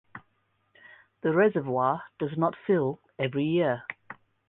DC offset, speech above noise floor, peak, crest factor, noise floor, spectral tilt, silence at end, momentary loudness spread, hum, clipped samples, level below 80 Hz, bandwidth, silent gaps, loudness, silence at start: under 0.1%; 46 dB; -12 dBFS; 18 dB; -72 dBFS; -10.5 dB/octave; 0.35 s; 10 LU; none; under 0.1%; -70 dBFS; 4 kHz; none; -27 LUFS; 0.15 s